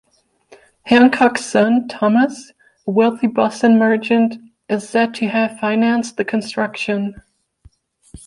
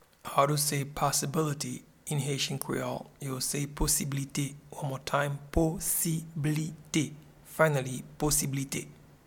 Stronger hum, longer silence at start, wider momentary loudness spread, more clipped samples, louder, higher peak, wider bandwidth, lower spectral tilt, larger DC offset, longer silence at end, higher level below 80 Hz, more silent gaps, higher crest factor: neither; first, 0.85 s vs 0.25 s; about the same, 11 LU vs 11 LU; neither; first, -16 LUFS vs -30 LUFS; first, -2 dBFS vs -10 dBFS; second, 11 kHz vs 19 kHz; first, -5.5 dB/octave vs -4 dB/octave; neither; second, 0.1 s vs 0.3 s; second, -56 dBFS vs -46 dBFS; neither; second, 16 dB vs 22 dB